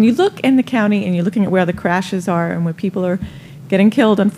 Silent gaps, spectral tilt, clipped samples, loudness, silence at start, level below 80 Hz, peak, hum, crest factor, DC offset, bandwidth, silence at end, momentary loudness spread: none; -7 dB/octave; under 0.1%; -16 LUFS; 0 s; -50 dBFS; -2 dBFS; none; 14 dB; under 0.1%; 13 kHz; 0 s; 7 LU